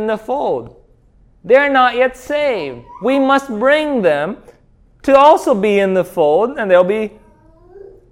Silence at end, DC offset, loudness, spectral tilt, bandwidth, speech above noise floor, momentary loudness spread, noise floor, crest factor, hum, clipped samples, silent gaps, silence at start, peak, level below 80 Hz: 0.3 s; under 0.1%; -14 LUFS; -5.5 dB/octave; 15 kHz; 36 dB; 13 LU; -50 dBFS; 14 dB; none; under 0.1%; none; 0 s; 0 dBFS; -50 dBFS